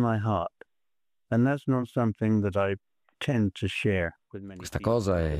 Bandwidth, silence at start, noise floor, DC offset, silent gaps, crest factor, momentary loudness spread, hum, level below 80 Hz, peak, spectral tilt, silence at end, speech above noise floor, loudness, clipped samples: 14.5 kHz; 0 s; under -90 dBFS; under 0.1%; none; 14 dB; 12 LU; none; -50 dBFS; -14 dBFS; -7 dB/octave; 0 s; over 63 dB; -28 LUFS; under 0.1%